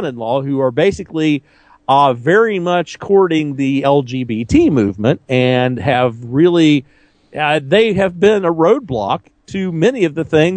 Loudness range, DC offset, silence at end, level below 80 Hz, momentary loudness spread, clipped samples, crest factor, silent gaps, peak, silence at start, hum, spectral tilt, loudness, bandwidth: 1 LU; under 0.1%; 0 s; -44 dBFS; 7 LU; under 0.1%; 14 dB; none; 0 dBFS; 0 s; none; -6.5 dB/octave; -14 LUFS; 9.2 kHz